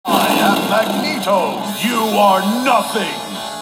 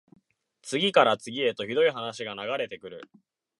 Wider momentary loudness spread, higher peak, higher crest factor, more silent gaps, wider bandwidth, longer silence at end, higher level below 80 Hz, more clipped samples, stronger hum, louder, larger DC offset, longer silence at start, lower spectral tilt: second, 7 LU vs 21 LU; first, 0 dBFS vs -4 dBFS; second, 16 dB vs 24 dB; neither; first, 16.5 kHz vs 11.5 kHz; second, 0 s vs 0.55 s; first, -62 dBFS vs -76 dBFS; neither; neither; first, -16 LUFS vs -26 LUFS; neither; second, 0.05 s vs 0.65 s; about the same, -4 dB/octave vs -4 dB/octave